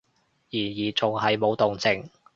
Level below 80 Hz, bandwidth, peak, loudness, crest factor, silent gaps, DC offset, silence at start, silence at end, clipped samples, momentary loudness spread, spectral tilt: -60 dBFS; 7.6 kHz; -6 dBFS; -25 LUFS; 20 dB; none; under 0.1%; 0.55 s; 0.3 s; under 0.1%; 7 LU; -5 dB/octave